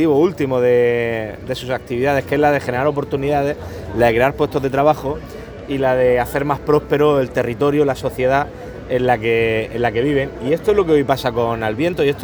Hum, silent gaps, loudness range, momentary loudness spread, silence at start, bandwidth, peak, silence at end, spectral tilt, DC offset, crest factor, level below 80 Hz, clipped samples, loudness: none; none; 1 LU; 9 LU; 0 s; over 20 kHz; 0 dBFS; 0 s; -6.5 dB/octave; under 0.1%; 16 dB; -40 dBFS; under 0.1%; -17 LUFS